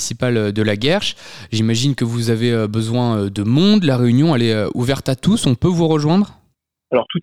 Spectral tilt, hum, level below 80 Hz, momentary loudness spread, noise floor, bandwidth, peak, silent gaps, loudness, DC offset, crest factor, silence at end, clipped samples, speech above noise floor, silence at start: -6 dB/octave; none; -46 dBFS; 6 LU; -64 dBFS; 14 kHz; -2 dBFS; none; -17 LUFS; 1%; 14 dB; 0 s; under 0.1%; 48 dB; 0 s